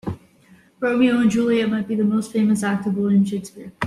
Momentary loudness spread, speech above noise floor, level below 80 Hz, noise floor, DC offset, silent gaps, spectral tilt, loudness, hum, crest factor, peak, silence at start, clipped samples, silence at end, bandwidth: 12 LU; 33 dB; -58 dBFS; -53 dBFS; under 0.1%; none; -6.5 dB/octave; -20 LUFS; none; 14 dB; -6 dBFS; 0.05 s; under 0.1%; 0 s; 12.5 kHz